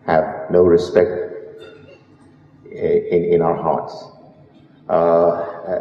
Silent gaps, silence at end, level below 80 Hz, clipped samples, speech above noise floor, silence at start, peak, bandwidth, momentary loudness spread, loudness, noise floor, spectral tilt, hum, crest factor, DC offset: none; 0 s; -52 dBFS; under 0.1%; 32 dB; 0.05 s; 0 dBFS; 7.2 kHz; 21 LU; -17 LUFS; -48 dBFS; -8 dB/octave; none; 18 dB; under 0.1%